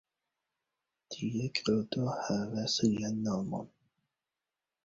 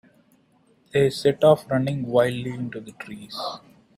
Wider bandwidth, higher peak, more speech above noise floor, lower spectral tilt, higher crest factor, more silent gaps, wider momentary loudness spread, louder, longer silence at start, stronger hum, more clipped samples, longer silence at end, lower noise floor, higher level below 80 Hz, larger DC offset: second, 7.8 kHz vs 14.5 kHz; second, -14 dBFS vs -4 dBFS; first, over 57 dB vs 38 dB; second, -5 dB/octave vs -6.5 dB/octave; about the same, 22 dB vs 20 dB; neither; second, 10 LU vs 19 LU; second, -33 LUFS vs -23 LUFS; first, 1.1 s vs 0.95 s; neither; neither; first, 1.2 s vs 0.4 s; first, under -90 dBFS vs -61 dBFS; second, -66 dBFS vs -60 dBFS; neither